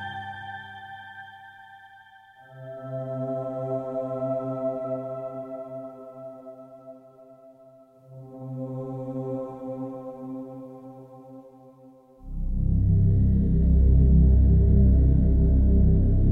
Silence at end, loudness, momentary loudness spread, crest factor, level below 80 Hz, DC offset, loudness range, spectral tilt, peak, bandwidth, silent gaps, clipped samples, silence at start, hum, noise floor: 0 s; -24 LUFS; 25 LU; 16 dB; -26 dBFS; under 0.1%; 19 LU; -11 dB/octave; -8 dBFS; 3.4 kHz; none; under 0.1%; 0 s; none; -53 dBFS